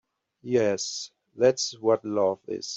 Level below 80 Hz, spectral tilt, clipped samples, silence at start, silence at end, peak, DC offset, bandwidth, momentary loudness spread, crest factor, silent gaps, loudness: -70 dBFS; -4 dB/octave; under 0.1%; 0.45 s; 0 s; -10 dBFS; under 0.1%; 8.2 kHz; 12 LU; 18 dB; none; -26 LUFS